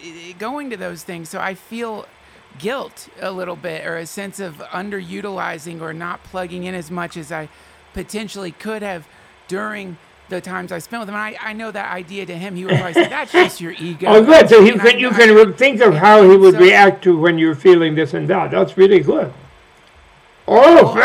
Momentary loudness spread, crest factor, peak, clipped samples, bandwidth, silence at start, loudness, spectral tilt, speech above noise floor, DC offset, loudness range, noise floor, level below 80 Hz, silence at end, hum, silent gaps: 22 LU; 14 dB; 0 dBFS; 0.3%; 14.5 kHz; 0.05 s; -10 LUFS; -5.5 dB/octave; 34 dB; under 0.1%; 19 LU; -47 dBFS; -52 dBFS; 0 s; none; none